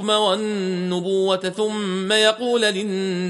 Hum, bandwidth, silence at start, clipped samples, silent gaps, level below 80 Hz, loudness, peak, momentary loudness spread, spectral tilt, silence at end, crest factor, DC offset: none; 11.5 kHz; 0 s; under 0.1%; none; -70 dBFS; -20 LUFS; -4 dBFS; 7 LU; -4 dB/octave; 0 s; 16 dB; under 0.1%